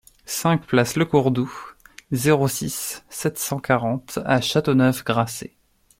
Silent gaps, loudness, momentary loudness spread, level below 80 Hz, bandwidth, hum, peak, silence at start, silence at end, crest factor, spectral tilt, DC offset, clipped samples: none; -22 LUFS; 11 LU; -54 dBFS; 16.5 kHz; none; -2 dBFS; 0.3 s; 0.55 s; 20 dB; -5 dB/octave; under 0.1%; under 0.1%